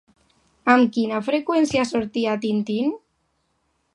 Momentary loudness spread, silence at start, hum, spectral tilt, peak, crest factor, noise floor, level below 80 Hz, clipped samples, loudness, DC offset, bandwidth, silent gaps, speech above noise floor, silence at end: 8 LU; 0.65 s; none; -5 dB/octave; -2 dBFS; 22 dB; -70 dBFS; -62 dBFS; under 0.1%; -21 LUFS; under 0.1%; 11.5 kHz; none; 49 dB; 1 s